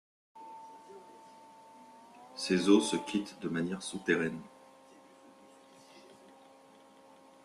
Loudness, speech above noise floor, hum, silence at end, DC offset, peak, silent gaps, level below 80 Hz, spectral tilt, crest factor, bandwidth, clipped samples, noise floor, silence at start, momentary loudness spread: -31 LUFS; 28 dB; none; 1.45 s; under 0.1%; -12 dBFS; none; -74 dBFS; -4.5 dB/octave; 24 dB; 12.5 kHz; under 0.1%; -59 dBFS; 0.35 s; 29 LU